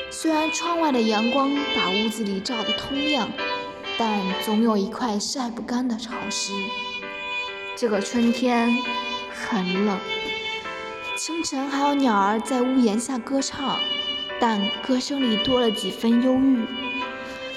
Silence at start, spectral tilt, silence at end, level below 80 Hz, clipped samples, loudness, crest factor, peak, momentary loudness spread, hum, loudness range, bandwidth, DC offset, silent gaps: 0 s; -3.5 dB/octave; 0 s; -58 dBFS; under 0.1%; -23 LUFS; 16 dB; -8 dBFS; 8 LU; none; 3 LU; 13.5 kHz; under 0.1%; none